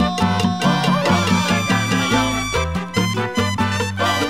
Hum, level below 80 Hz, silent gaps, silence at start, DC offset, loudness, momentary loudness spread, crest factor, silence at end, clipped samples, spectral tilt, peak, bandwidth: none; -38 dBFS; none; 0 s; 0.6%; -18 LUFS; 4 LU; 16 dB; 0 s; under 0.1%; -4.5 dB/octave; -4 dBFS; 16 kHz